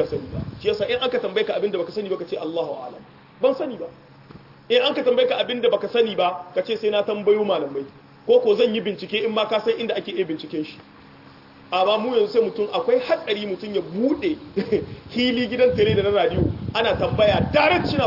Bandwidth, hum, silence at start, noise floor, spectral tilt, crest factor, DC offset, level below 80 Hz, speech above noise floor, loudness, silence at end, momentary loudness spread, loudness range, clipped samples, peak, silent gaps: 5.8 kHz; none; 0 s; -46 dBFS; -7 dB/octave; 16 dB; under 0.1%; -50 dBFS; 25 dB; -22 LUFS; 0 s; 10 LU; 5 LU; under 0.1%; -6 dBFS; none